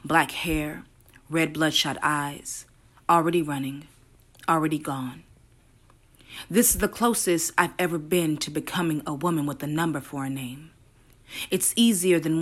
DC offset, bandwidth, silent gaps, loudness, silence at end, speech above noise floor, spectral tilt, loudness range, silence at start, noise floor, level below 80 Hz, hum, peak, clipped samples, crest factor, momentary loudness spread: under 0.1%; 16 kHz; none; -25 LUFS; 0 s; 32 dB; -3.5 dB/octave; 4 LU; 0.05 s; -57 dBFS; -50 dBFS; none; -6 dBFS; under 0.1%; 20 dB; 15 LU